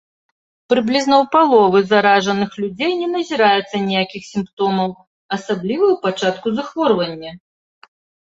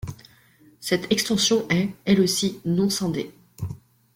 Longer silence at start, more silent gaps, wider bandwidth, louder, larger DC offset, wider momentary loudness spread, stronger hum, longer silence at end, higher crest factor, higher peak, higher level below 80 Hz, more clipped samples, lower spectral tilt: first, 0.7 s vs 0.05 s; first, 4.53-4.57 s, 5.07-5.29 s vs none; second, 8 kHz vs 16.5 kHz; first, -17 LUFS vs -22 LUFS; neither; second, 12 LU vs 16 LU; neither; first, 0.95 s vs 0.4 s; about the same, 16 dB vs 18 dB; first, -2 dBFS vs -6 dBFS; second, -60 dBFS vs -54 dBFS; neither; about the same, -5 dB/octave vs -4 dB/octave